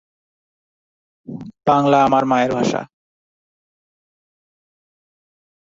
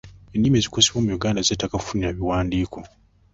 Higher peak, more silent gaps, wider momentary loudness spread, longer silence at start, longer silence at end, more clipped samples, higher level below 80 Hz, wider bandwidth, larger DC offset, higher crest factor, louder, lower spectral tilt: about the same, -2 dBFS vs 0 dBFS; neither; first, 20 LU vs 10 LU; first, 1.3 s vs 0.05 s; first, 2.8 s vs 0.5 s; neither; second, -58 dBFS vs -40 dBFS; about the same, 7.8 kHz vs 8.2 kHz; neither; about the same, 20 dB vs 22 dB; first, -17 LUFS vs -22 LUFS; first, -6 dB/octave vs -4 dB/octave